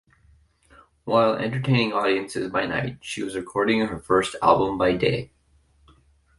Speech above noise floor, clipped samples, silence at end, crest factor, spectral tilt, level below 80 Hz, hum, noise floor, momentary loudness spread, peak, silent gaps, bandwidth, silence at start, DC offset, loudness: 38 dB; under 0.1%; 1.15 s; 22 dB; -6 dB/octave; -52 dBFS; none; -61 dBFS; 10 LU; -4 dBFS; none; 11.5 kHz; 1.05 s; under 0.1%; -23 LUFS